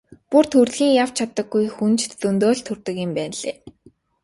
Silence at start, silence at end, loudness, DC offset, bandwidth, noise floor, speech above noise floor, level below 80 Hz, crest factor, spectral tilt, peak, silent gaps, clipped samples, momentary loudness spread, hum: 0.3 s; 0.55 s; -20 LUFS; under 0.1%; 11.5 kHz; -55 dBFS; 35 dB; -60 dBFS; 18 dB; -4.5 dB/octave; -2 dBFS; none; under 0.1%; 11 LU; none